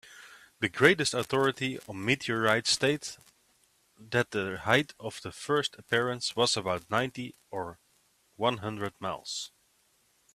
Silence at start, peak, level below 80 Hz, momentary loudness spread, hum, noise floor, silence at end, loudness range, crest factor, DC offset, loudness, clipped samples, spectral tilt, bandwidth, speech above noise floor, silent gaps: 0.1 s; -6 dBFS; -66 dBFS; 15 LU; none; -69 dBFS; 0.85 s; 7 LU; 26 dB; under 0.1%; -29 LUFS; under 0.1%; -3.5 dB/octave; 15 kHz; 39 dB; none